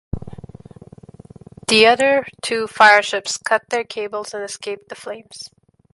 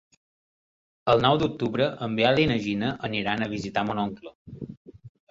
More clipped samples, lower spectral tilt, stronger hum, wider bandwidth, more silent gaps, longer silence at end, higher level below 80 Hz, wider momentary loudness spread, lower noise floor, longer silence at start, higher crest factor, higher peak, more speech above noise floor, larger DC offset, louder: neither; second, -2.5 dB/octave vs -6.5 dB/octave; neither; first, 11.5 kHz vs 7.8 kHz; second, none vs 4.35-4.46 s, 4.77-4.85 s; first, 0.5 s vs 0.2 s; first, -48 dBFS vs -54 dBFS; about the same, 21 LU vs 20 LU; second, -42 dBFS vs under -90 dBFS; second, 0.15 s vs 1.05 s; about the same, 20 dB vs 20 dB; first, 0 dBFS vs -6 dBFS; second, 24 dB vs over 65 dB; neither; first, -17 LUFS vs -25 LUFS